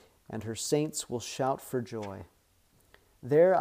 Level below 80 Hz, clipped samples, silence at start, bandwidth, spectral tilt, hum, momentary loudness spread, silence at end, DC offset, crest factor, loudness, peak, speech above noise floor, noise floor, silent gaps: -68 dBFS; under 0.1%; 0.3 s; 15.5 kHz; -5 dB/octave; none; 17 LU; 0 s; under 0.1%; 18 dB; -31 LUFS; -12 dBFS; 37 dB; -66 dBFS; none